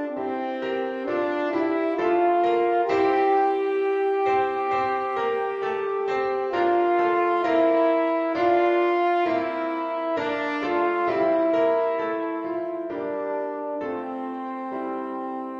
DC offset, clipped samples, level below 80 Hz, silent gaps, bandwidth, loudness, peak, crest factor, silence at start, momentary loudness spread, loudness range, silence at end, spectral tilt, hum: under 0.1%; under 0.1%; -66 dBFS; none; 7 kHz; -24 LUFS; -10 dBFS; 14 dB; 0 s; 9 LU; 4 LU; 0 s; -6 dB/octave; none